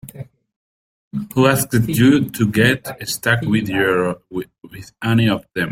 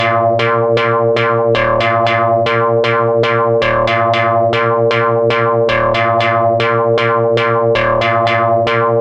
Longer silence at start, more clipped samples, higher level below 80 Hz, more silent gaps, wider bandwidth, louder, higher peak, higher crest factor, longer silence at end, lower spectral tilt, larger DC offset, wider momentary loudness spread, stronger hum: about the same, 0.05 s vs 0 s; neither; second, -50 dBFS vs -42 dBFS; first, 0.56-1.11 s vs none; first, 16.5 kHz vs 8 kHz; second, -17 LUFS vs -12 LUFS; about the same, 0 dBFS vs 0 dBFS; first, 18 dB vs 12 dB; about the same, 0 s vs 0 s; about the same, -5.5 dB/octave vs -6.5 dB/octave; neither; first, 17 LU vs 0 LU; neither